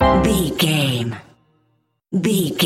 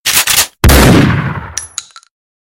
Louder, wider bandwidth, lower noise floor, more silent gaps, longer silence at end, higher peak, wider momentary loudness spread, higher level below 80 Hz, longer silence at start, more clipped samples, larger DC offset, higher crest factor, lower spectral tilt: second, -19 LUFS vs -8 LUFS; about the same, 16.5 kHz vs 17.5 kHz; first, -66 dBFS vs -28 dBFS; neither; second, 0 s vs 0.7 s; second, -4 dBFS vs 0 dBFS; second, 10 LU vs 16 LU; second, -34 dBFS vs -18 dBFS; about the same, 0 s vs 0.05 s; second, under 0.1% vs 0.2%; neither; first, 16 dB vs 10 dB; about the same, -5 dB/octave vs -4 dB/octave